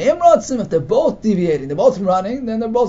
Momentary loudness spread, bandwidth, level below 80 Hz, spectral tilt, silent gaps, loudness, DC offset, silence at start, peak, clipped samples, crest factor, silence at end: 7 LU; 7.8 kHz; -46 dBFS; -6.5 dB/octave; none; -16 LUFS; under 0.1%; 0 s; 0 dBFS; under 0.1%; 16 dB; 0 s